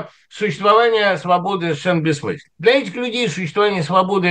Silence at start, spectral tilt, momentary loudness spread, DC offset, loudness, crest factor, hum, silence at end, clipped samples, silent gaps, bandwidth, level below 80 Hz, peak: 0 s; -5.5 dB/octave; 10 LU; under 0.1%; -17 LUFS; 16 dB; none; 0 s; under 0.1%; none; 10 kHz; -64 dBFS; 0 dBFS